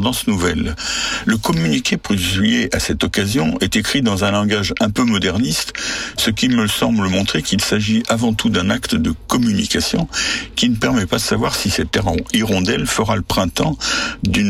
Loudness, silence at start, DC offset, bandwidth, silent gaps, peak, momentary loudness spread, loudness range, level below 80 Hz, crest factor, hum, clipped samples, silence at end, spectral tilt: -17 LUFS; 0 s; under 0.1%; 16.5 kHz; none; -4 dBFS; 3 LU; 1 LU; -36 dBFS; 12 dB; none; under 0.1%; 0 s; -4 dB/octave